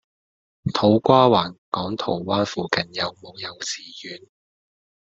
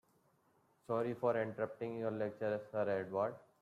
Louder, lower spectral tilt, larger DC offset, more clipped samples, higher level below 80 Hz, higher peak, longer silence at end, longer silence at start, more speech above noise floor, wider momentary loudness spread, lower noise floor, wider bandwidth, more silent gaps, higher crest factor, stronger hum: first, -21 LUFS vs -39 LUFS; second, -5 dB/octave vs -8.5 dB/octave; neither; neither; first, -58 dBFS vs -82 dBFS; first, -2 dBFS vs -22 dBFS; first, 1 s vs 0.2 s; second, 0.65 s vs 0.9 s; first, over 68 dB vs 36 dB; first, 19 LU vs 5 LU; first, under -90 dBFS vs -74 dBFS; second, 8.2 kHz vs 13 kHz; first, 1.58-1.72 s vs none; first, 22 dB vs 16 dB; neither